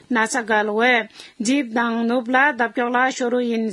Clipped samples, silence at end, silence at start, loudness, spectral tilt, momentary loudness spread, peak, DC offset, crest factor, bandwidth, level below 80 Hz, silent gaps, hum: under 0.1%; 0 s; 0.1 s; -19 LUFS; -3.5 dB/octave; 5 LU; -2 dBFS; under 0.1%; 18 dB; 12 kHz; -72 dBFS; none; none